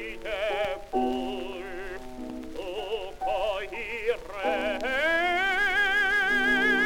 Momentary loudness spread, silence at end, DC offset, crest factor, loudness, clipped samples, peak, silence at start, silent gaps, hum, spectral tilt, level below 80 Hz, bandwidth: 15 LU; 0 s; 0.3%; 14 dB; -27 LUFS; under 0.1%; -14 dBFS; 0 s; none; none; -3 dB/octave; -46 dBFS; 17 kHz